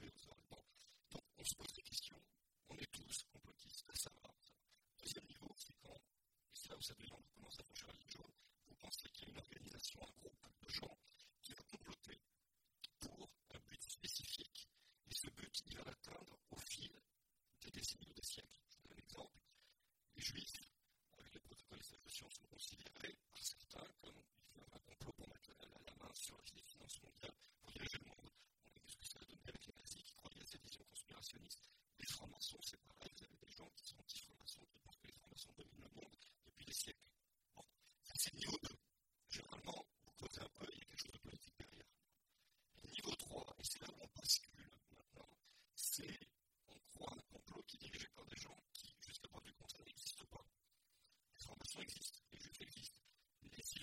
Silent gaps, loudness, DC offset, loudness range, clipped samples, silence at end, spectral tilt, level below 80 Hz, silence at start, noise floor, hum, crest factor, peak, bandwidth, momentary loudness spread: none; -52 LUFS; under 0.1%; 10 LU; under 0.1%; 0 s; -1.5 dB/octave; -74 dBFS; 0 s; -87 dBFS; none; 32 dB; -24 dBFS; 16.5 kHz; 17 LU